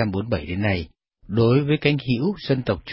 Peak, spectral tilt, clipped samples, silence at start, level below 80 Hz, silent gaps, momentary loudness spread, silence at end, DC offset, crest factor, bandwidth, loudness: -4 dBFS; -11.5 dB/octave; under 0.1%; 0 s; -42 dBFS; none; 8 LU; 0 s; under 0.1%; 18 dB; 5.8 kHz; -22 LUFS